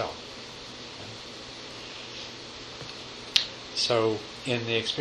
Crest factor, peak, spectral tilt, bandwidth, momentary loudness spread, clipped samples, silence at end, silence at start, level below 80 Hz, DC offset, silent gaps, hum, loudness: 32 dB; -2 dBFS; -3 dB/octave; 12 kHz; 14 LU; under 0.1%; 0 s; 0 s; -60 dBFS; under 0.1%; none; none; -31 LUFS